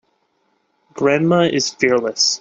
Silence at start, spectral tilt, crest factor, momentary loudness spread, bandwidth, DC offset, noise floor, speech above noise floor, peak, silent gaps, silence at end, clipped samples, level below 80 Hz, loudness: 0.95 s; -3.5 dB/octave; 16 dB; 3 LU; 8.2 kHz; under 0.1%; -65 dBFS; 49 dB; -2 dBFS; none; 0.05 s; under 0.1%; -60 dBFS; -16 LUFS